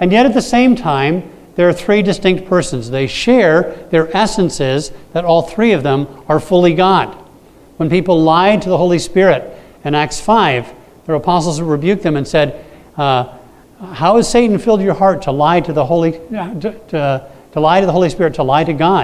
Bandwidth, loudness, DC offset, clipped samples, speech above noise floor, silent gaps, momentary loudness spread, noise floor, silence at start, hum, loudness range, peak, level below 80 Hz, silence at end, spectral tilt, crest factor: 14.5 kHz; -13 LUFS; under 0.1%; under 0.1%; 30 dB; none; 10 LU; -42 dBFS; 0 s; none; 2 LU; 0 dBFS; -42 dBFS; 0 s; -6 dB/octave; 14 dB